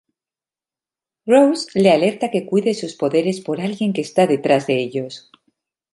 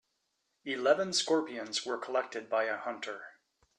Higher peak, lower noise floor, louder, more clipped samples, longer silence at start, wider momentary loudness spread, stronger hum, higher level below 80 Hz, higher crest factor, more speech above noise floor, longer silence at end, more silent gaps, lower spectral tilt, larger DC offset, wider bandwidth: first, -2 dBFS vs -14 dBFS; first, under -90 dBFS vs -80 dBFS; first, -18 LUFS vs -32 LUFS; neither; first, 1.25 s vs 0.65 s; about the same, 11 LU vs 13 LU; neither; first, -68 dBFS vs -84 dBFS; about the same, 18 dB vs 20 dB; first, over 73 dB vs 48 dB; first, 0.75 s vs 0.5 s; neither; first, -6 dB/octave vs -2 dB/octave; neither; about the same, 11.5 kHz vs 12 kHz